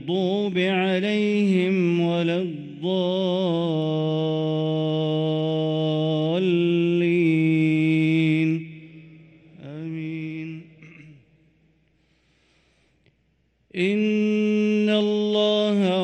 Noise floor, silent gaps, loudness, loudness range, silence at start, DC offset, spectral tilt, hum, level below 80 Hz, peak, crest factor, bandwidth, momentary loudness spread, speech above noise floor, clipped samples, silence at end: -66 dBFS; none; -22 LUFS; 16 LU; 0 s; under 0.1%; -7.5 dB/octave; none; -68 dBFS; -10 dBFS; 14 dB; 8.8 kHz; 11 LU; 45 dB; under 0.1%; 0 s